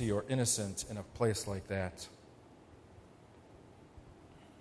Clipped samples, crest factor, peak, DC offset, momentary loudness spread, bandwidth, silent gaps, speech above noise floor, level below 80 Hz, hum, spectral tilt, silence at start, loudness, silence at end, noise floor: under 0.1%; 20 dB; -20 dBFS; under 0.1%; 26 LU; 11 kHz; none; 23 dB; -60 dBFS; none; -4.5 dB/octave; 0 s; -36 LUFS; 0 s; -59 dBFS